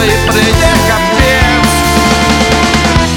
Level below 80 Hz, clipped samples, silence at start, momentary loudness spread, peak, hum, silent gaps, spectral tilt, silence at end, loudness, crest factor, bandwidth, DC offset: -18 dBFS; under 0.1%; 0 s; 1 LU; 0 dBFS; none; none; -4 dB/octave; 0 s; -8 LUFS; 8 dB; 19 kHz; under 0.1%